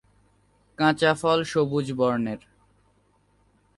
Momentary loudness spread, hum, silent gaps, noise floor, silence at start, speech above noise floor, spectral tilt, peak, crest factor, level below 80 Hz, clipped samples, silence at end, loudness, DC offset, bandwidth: 8 LU; 50 Hz at -55 dBFS; none; -64 dBFS; 0.8 s; 41 dB; -5.5 dB/octave; -8 dBFS; 20 dB; -62 dBFS; under 0.1%; 1.4 s; -24 LUFS; under 0.1%; 11.5 kHz